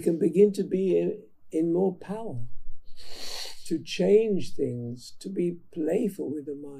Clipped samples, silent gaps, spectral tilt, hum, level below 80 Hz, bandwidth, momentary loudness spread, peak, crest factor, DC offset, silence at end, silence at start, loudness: under 0.1%; none; -6.5 dB/octave; none; -50 dBFS; 14.5 kHz; 17 LU; -8 dBFS; 18 dB; under 0.1%; 0 s; 0 s; -27 LUFS